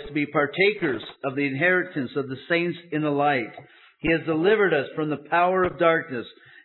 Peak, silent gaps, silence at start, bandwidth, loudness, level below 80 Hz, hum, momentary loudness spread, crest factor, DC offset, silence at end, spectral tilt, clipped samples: -6 dBFS; none; 0 s; 4.3 kHz; -23 LUFS; -56 dBFS; none; 10 LU; 18 dB; under 0.1%; 0.35 s; -9.5 dB/octave; under 0.1%